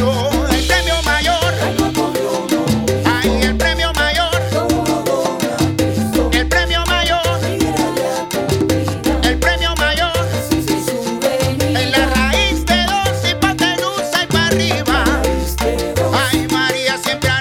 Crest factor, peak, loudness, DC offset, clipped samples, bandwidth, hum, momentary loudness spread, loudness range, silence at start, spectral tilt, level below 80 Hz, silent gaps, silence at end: 16 dB; 0 dBFS; -15 LUFS; under 0.1%; under 0.1%; 18 kHz; none; 4 LU; 1 LU; 0 s; -4 dB/octave; -26 dBFS; none; 0 s